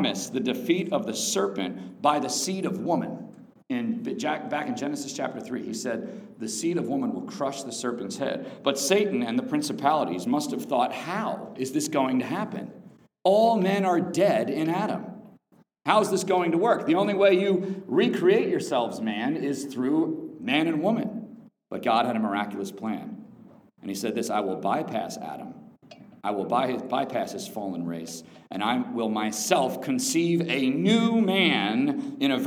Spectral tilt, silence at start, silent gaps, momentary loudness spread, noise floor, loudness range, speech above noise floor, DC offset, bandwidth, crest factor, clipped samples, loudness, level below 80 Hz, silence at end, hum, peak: -4.5 dB/octave; 0 s; none; 12 LU; -61 dBFS; 7 LU; 35 dB; under 0.1%; over 20 kHz; 22 dB; under 0.1%; -26 LUFS; -78 dBFS; 0 s; none; -4 dBFS